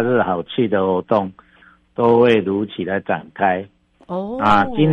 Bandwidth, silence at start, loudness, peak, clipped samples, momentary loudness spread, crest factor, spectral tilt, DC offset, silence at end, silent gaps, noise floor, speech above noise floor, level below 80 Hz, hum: 7.8 kHz; 0 s; -18 LUFS; -2 dBFS; under 0.1%; 12 LU; 16 dB; -8 dB/octave; under 0.1%; 0 s; none; -51 dBFS; 34 dB; -50 dBFS; none